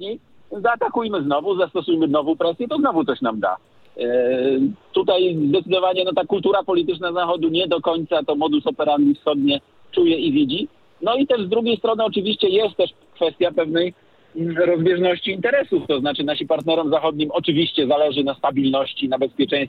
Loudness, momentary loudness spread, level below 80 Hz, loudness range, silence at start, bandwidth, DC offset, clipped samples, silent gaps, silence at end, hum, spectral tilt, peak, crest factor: -20 LUFS; 6 LU; -64 dBFS; 1 LU; 0 s; 4.7 kHz; under 0.1%; under 0.1%; none; 0 s; none; -8 dB/octave; -6 dBFS; 14 dB